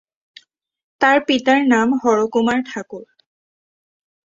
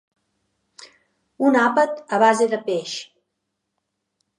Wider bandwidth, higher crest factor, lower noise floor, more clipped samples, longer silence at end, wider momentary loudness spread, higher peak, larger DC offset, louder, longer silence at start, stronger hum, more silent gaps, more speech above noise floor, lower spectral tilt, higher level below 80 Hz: second, 7.8 kHz vs 11.5 kHz; about the same, 18 dB vs 20 dB; second, -49 dBFS vs -78 dBFS; neither; second, 1.2 s vs 1.35 s; first, 16 LU vs 11 LU; about the same, -2 dBFS vs -2 dBFS; neither; first, -16 LUFS vs -19 LUFS; first, 1 s vs 0.8 s; neither; neither; second, 33 dB vs 59 dB; about the same, -4 dB/octave vs -4 dB/octave; first, -62 dBFS vs -80 dBFS